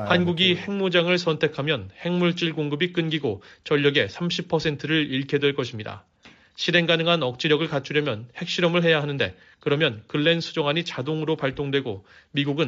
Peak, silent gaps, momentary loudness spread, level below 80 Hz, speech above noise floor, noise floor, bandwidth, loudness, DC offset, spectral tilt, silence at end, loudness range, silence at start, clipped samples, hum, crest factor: -4 dBFS; none; 9 LU; -60 dBFS; 30 dB; -53 dBFS; 7.6 kHz; -23 LUFS; under 0.1%; -5.5 dB/octave; 0 s; 2 LU; 0 s; under 0.1%; none; 20 dB